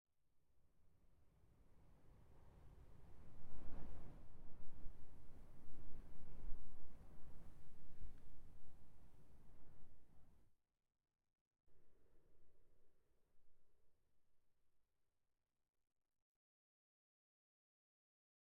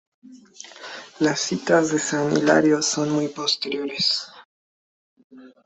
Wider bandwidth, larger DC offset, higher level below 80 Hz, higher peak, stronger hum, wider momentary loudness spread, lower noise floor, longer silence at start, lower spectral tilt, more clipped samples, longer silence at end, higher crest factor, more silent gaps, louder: second, 2.5 kHz vs 8.4 kHz; neither; about the same, -62 dBFS vs -66 dBFS; second, -28 dBFS vs -4 dBFS; neither; second, 8 LU vs 20 LU; about the same, -87 dBFS vs under -90 dBFS; first, 1.7 s vs 0.3 s; first, -7.5 dB/octave vs -3.5 dB/octave; neither; first, 4.55 s vs 0.2 s; about the same, 16 dB vs 20 dB; second, 11.41-11.51 s vs 4.45-5.16 s, 5.24-5.30 s; second, -65 LUFS vs -21 LUFS